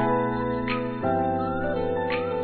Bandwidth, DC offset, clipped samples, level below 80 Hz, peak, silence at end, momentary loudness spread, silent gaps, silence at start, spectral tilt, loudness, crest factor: 4.6 kHz; 0.3%; under 0.1%; -46 dBFS; -12 dBFS; 0 s; 2 LU; none; 0 s; -10.5 dB/octave; -26 LUFS; 14 dB